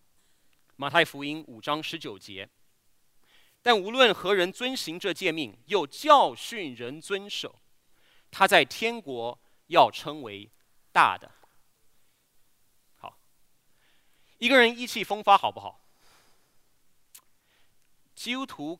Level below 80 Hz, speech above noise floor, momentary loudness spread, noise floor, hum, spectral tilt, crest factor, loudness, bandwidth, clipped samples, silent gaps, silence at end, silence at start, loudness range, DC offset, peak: -74 dBFS; 38 dB; 21 LU; -64 dBFS; none; -3 dB/octave; 26 dB; -25 LUFS; 16 kHz; under 0.1%; none; 0.05 s; 0.8 s; 6 LU; under 0.1%; -2 dBFS